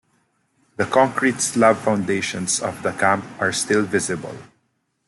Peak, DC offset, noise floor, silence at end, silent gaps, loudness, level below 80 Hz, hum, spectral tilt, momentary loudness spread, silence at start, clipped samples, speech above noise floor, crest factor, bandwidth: -4 dBFS; under 0.1%; -69 dBFS; 0.6 s; none; -20 LUFS; -62 dBFS; none; -3.5 dB/octave; 10 LU; 0.8 s; under 0.1%; 49 dB; 18 dB; 12.5 kHz